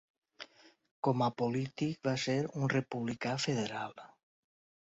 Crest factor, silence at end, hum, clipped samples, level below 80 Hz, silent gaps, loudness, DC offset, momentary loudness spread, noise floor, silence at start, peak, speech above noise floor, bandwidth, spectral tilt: 20 dB; 0.8 s; none; under 0.1%; -72 dBFS; 0.91-1.03 s; -35 LUFS; under 0.1%; 19 LU; -56 dBFS; 0.4 s; -16 dBFS; 22 dB; 7.6 kHz; -5 dB/octave